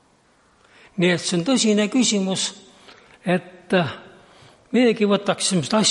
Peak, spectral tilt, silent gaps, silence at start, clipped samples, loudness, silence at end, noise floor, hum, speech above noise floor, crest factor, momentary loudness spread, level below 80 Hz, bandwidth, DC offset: -6 dBFS; -4 dB/octave; none; 0.95 s; under 0.1%; -20 LUFS; 0 s; -58 dBFS; none; 39 dB; 16 dB; 9 LU; -66 dBFS; 11.5 kHz; under 0.1%